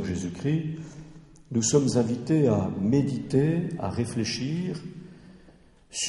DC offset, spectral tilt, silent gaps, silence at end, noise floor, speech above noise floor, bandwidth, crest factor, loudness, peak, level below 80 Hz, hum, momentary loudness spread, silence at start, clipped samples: under 0.1%; -5.5 dB/octave; none; 0 s; -55 dBFS; 29 dB; 11.5 kHz; 18 dB; -26 LUFS; -8 dBFS; -56 dBFS; none; 16 LU; 0 s; under 0.1%